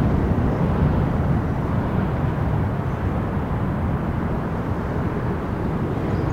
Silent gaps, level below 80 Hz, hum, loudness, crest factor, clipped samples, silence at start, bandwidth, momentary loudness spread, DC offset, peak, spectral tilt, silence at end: none; -30 dBFS; none; -23 LUFS; 14 dB; under 0.1%; 0 s; 9.6 kHz; 5 LU; 0.5%; -8 dBFS; -9.5 dB/octave; 0 s